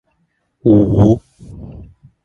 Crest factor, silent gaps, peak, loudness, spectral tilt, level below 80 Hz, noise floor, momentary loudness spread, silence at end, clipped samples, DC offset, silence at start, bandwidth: 16 dB; none; 0 dBFS; -13 LUFS; -10.5 dB/octave; -34 dBFS; -65 dBFS; 24 LU; 0.4 s; under 0.1%; under 0.1%; 0.65 s; 6.8 kHz